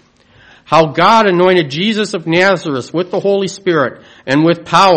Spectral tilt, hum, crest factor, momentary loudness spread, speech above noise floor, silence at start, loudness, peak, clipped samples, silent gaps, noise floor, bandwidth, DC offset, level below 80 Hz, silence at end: -5.5 dB/octave; none; 12 dB; 9 LU; 34 dB; 0.7 s; -12 LUFS; 0 dBFS; 0.3%; none; -46 dBFS; 9.4 kHz; under 0.1%; -52 dBFS; 0 s